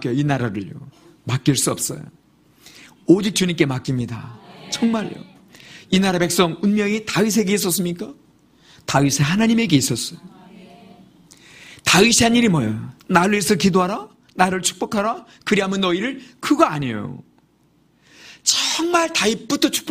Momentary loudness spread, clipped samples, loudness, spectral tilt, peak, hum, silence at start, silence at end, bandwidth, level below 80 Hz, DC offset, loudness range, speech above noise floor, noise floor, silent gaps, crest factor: 15 LU; under 0.1%; -19 LUFS; -4 dB/octave; 0 dBFS; none; 0 s; 0 s; 15.5 kHz; -52 dBFS; under 0.1%; 5 LU; 40 dB; -58 dBFS; none; 20 dB